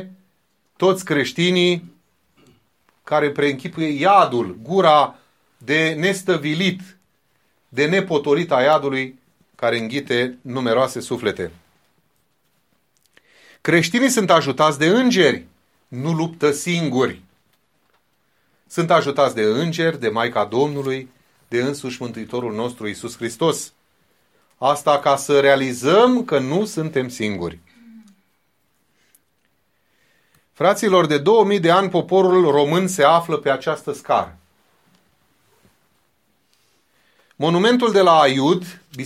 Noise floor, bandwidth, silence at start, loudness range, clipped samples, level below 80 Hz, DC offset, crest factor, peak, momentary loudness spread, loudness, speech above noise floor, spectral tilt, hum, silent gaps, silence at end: -67 dBFS; 15.5 kHz; 0 s; 8 LU; under 0.1%; -62 dBFS; under 0.1%; 18 dB; 0 dBFS; 12 LU; -18 LUFS; 49 dB; -5 dB/octave; none; none; 0 s